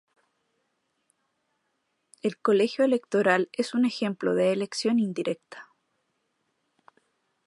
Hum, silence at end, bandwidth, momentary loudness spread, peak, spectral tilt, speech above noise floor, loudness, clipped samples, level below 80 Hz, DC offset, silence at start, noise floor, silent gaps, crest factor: none; 1.85 s; 11.5 kHz; 9 LU; -6 dBFS; -5.5 dB/octave; 51 dB; -26 LUFS; under 0.1%; -82 dBFS; under 0.1%; 2.25 s; -76 dBFS; none; 22 dB